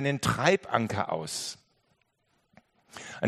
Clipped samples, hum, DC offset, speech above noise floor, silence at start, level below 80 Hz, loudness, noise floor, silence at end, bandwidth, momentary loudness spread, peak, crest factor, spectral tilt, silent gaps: under 0.1%; none; under 0.1%; 44 dB; 0 s; -62 dBFS; -28 LUFS; -73 dBFS; 0 s; 13 kHz; 21 LU; -6 dBFS; 24 dB; -4.5 dB/octave; none